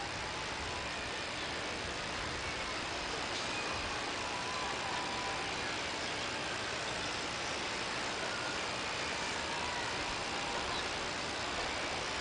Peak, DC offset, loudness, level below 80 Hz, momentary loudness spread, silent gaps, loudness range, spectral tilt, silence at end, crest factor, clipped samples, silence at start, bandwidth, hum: -24 dBFS; under 0.1%; -36 LUFS; -56 dBFS; 2 LU; none; 1 LU; -2 dB/octave; 0 s; 14 dB; under 0.1%; 0 s; 10.5 kHz; none